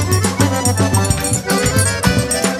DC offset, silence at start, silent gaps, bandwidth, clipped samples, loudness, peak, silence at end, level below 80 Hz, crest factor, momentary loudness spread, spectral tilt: under 0.1%; 0 s; none; 16 kHz; under 0.1%; -15 LUFS; 0 dBFS; 0 s; -30 dBFS; 16 dB; 2 LU; -4 dB/octave